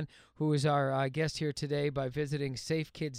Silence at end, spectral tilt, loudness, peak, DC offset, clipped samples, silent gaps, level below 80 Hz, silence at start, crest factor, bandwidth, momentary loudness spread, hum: 0 s; -6 dB/octave; -33 LUFS; -16 dBFS; under 0.1%; under 0.1%; none; -62 dBFS; 0 s; 16 dB; 13.5 kHz; 6 LU; none